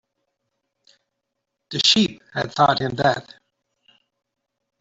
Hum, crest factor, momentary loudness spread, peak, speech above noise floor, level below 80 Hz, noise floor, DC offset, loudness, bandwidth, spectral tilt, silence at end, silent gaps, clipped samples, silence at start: none; 22 dB; 13 LU; -2 dBFS; 59 dB; -60 dBFS; -79 dBFS; under 0.1%; -19 LUFS; 8 kHz; -4 dB/octave; 1.6 s; none; under 0.1%; 1.7 s